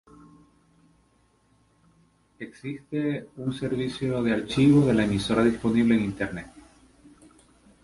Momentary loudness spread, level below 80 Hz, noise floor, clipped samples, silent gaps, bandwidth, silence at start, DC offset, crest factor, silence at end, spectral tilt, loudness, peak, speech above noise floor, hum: 18 LU; -52 dBFS; -65 dBFS; under 0.1%; none; 11.5 kHz; 2.4 s; under 0.1%; 18 dB; 1.25 s; -7 dB/octave; -24 LUFS; -8 dBFS; 40 dB; none